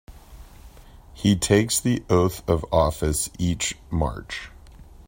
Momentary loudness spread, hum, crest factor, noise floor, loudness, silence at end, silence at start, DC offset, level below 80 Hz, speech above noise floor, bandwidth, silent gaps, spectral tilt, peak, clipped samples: 11 LU; none; 20 dB; -46 dBFS; -23 LUFS; 0.25 s; 0.1 s; under 0.1%; -38 dBFS; 24 dB; 16.5 kHz; none; -5 dB/octave; -4 dBFS; under 0.1%